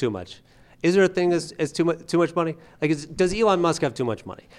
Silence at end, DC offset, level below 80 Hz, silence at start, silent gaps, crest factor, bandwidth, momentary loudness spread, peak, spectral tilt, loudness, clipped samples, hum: 0.25 s; under 0.1%; -50 dBFS; 0 s; none; 16 dB; 12 kHz; 9 LU; -6 dBFS; -5.5 dB/octave; -23 LUFS; under 0.1%; none